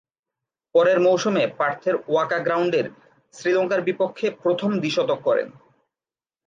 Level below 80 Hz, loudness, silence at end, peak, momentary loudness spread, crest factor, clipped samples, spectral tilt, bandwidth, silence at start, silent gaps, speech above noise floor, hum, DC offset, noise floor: -74 dBFS; -22 LUFS; 0.95 s; -6 dBFS; 7 LU; 16 dB; under 0.1%; -5.5 dB/octave; 7.6 kHz; 0.75 s; none; over 69 dB; none; under 0.1%; under -90 dBFS